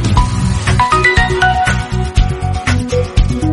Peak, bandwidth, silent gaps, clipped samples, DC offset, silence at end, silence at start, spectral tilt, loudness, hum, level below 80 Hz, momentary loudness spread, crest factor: 0 dBFS; 11.5 kHz; none; under 0.1%; under 0.1%; 0 s; 0 s; -5.5 dB/octave; -13 LUFS; none; -18 dBFS; 7 LU; 12 dB